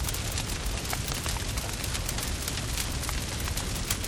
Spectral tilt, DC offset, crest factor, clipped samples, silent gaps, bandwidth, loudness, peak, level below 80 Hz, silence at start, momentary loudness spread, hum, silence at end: -3 dB/octave; under 0.1%; 20 dB; under 0.1%; none; 19.5 kHz; -31 LUFS; -12 dBFS; -36 dBFS; 0 s; 1 LU; none; 0 s